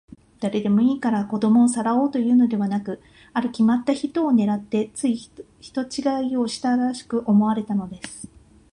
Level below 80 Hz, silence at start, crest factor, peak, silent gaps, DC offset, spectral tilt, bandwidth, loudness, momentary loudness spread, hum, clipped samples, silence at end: -60 dBFS; 0.4 s; 14 dB; -8 dBFS; none; under 0.1%; -6 dB/octave; 11 kHz; -22 LUFS; 12 LU; none; under 0.1%; 0.45 s